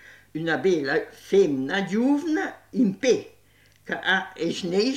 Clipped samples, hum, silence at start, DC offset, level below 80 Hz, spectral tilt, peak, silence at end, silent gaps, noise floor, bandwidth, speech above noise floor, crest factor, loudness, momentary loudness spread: under 0.1%; 50 Hz at -60 dBFS; 0.1 s; under 0.1%; -68 dBFS; -5 dB/octave; -8 dBFS; 0 s; none; -58 dBFS; 13.5 kHz; 35 dB; 16 dB; -24 LUFS; 8 LU